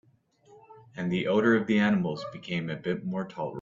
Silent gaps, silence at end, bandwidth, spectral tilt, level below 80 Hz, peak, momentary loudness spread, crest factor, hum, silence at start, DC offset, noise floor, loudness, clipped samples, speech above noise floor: none; 0 s; 7.4 kHz; -7.5 dB/octave; -66 dBFS; -10 dBFS; 12 LU; 18 dB; none; 0.5 s; under 0.1%; -62 dBFS; -28 LUFS; under 0.1%; 34 dB